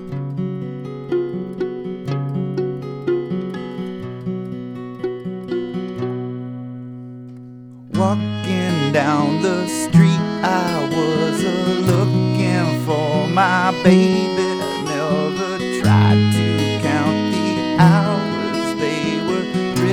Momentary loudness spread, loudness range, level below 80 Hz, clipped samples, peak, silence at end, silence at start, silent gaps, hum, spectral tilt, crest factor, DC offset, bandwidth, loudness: 15 LU; 10 LU; -52 dBFS; under 0.1%; 0 dBFS; 0 s; 0 s; none; none; -6.5 dB/octave; 18 dB; under 0.1%; 16 kHz; -19 LUFS